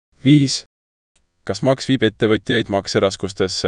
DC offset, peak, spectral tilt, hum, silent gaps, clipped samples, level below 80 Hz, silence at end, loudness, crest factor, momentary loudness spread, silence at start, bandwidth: under 0.1%; -2 dBFS; -5.5 dB/octave; none; 0.66-1.15 s; under 0.1%; -50 dBFS; 0 s; -18 LUFS; 18 dB; 9 LU; 0.25 s; 10.5 kHz